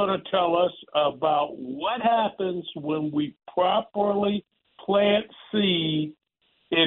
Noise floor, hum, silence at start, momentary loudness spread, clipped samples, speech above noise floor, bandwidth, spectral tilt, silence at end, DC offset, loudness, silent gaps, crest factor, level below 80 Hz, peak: -69 dBFS; none; 0 s; 7 LU; under 0.1%; 44 dB; 4.2 kHz; -3 dB/octave; 0 s; under 0.1%; -25 LUFS; none; 16 dB; -64 dBFS; -8 dBFS